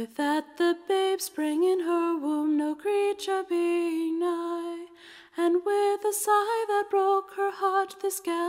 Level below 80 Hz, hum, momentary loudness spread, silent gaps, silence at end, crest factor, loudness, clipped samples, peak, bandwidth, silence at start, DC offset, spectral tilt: -78 dBFS; none; 7 LU; none; 0 s; 12 dB; -27 LUFS; under 0.1%; -14 dBFS; 16 kHz; 0 s; under 0.1%; -2 dB/octave